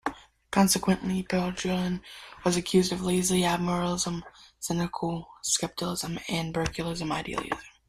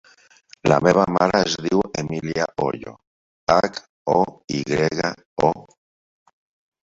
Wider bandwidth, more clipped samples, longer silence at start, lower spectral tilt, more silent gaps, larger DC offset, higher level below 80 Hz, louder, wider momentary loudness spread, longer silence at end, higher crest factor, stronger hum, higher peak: first, 15 kHz vs 8 kHz; neither; second, 0.05 s vs 0.65 s; second, -4 dB/octave vs -5.5 dB/octave; second, none vs 3.07-3.47 s, 3.89-4.05 s, 4.44-4.48 s, 5.25-5.37 s; neither; about the same, -52 dBFS vs -52 dBFS; second, -28 LUFS vs -21 LUFS; about the same, 9 LU vs 11 LU; second, 0.2 s vs 1.2 s; about the same, 20 dB vs 20 dB; neither; second, -8 dBFS vs -2 dBFS